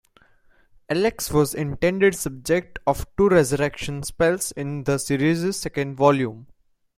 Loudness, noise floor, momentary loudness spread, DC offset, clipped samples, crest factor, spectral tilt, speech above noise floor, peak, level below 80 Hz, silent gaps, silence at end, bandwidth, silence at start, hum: -22 LUFS; -57 dBFS; 9 LU; under 0.1%; under 0.1%; 20 dB; -5 dB/octave; 35 dB; -4 dBFS; -44 dBFS; none; 0.55 s; 16.5 kHz; 0.9 s; none